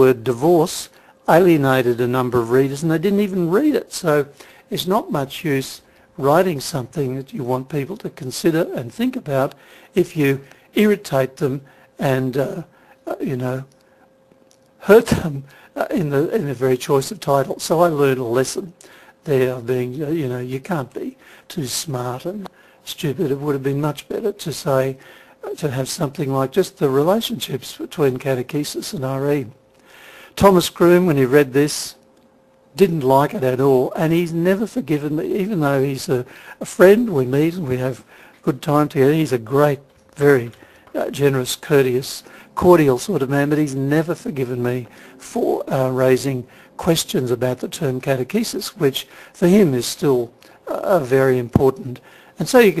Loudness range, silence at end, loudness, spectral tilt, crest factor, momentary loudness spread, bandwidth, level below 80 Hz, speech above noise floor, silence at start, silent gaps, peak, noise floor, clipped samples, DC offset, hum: 6 LU; 0 s; -19 LUFS; -6 dB/octave; 18 dB; 15 LU; 14 kHz; -52 dBFS; 35 dB; 0 s; none; 0 dBFS; -54 dBFS; under 0.1%; under 0.1%; none